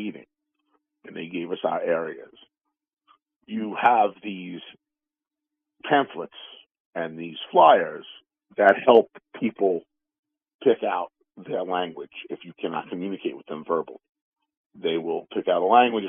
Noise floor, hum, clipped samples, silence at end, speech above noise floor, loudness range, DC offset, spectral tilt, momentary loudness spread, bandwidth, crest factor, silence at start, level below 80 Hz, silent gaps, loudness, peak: -89 dBFS; none; under 0.1%; 0 s; 66 dB; 10 LU; under 0.1%; -2.5 dB/octave; 20 LU; 3.7 kHz; 22 dB; 0 s; -78 dBFS; 6.80-6.93 s, 10.19-10.23 s, 10.55-10.59 s, 14.09-14.13 s, 14.21-14.32 s, 14.57-14.70 s; -23 LUFS; -2 dBFS